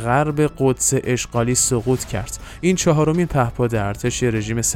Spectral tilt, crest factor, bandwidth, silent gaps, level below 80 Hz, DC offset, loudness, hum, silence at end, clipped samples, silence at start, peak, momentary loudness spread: -5 dB/octave; 16 dB; 16.5 kHz; none; -38 dBFS; under 0.1%; -19 LUFS; none; 0 s; under 0.1%; 0 s; -4 dBFS; 6 LU